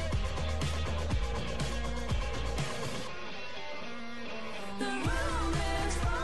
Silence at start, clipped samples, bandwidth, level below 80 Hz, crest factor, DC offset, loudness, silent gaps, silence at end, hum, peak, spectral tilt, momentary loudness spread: 0 s; under 0.1%; 12 kHz; -38 dBFS; 14 dB; 1%; -35 LUFS; none; 0 s; none; -20 dBFS; -5 dB/octave; 9 LU